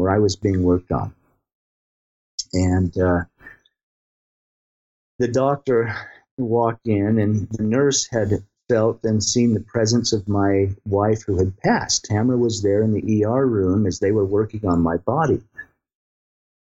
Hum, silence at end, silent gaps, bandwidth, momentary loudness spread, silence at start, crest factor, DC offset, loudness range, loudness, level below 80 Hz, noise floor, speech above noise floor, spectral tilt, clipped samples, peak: none; 1.15 s; 1.53-2.38 s, 3.83-5.19 s, 6.31-6.37 s; 8.2 kHz; 7 LU; 0 s; 14 dB; under 0.1%; 6 LU; -20 LUFS; -52 dBFS; -47 dBFS; 28 dB; -5.5 dB/octave; under 0.1%; -6 dBFS